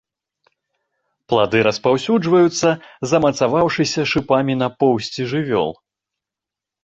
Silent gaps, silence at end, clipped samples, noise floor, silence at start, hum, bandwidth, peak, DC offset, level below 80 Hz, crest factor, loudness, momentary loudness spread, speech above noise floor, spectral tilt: none; 1.1 s; under 0.1%; -87 dBFS; 1.3 s; none; 8.2 kHz; -2 dBFS; under 0.1%; -52 dBFS; 16 dB; -18 LUFS; 6 LU; 69 dB; -5 dB/octave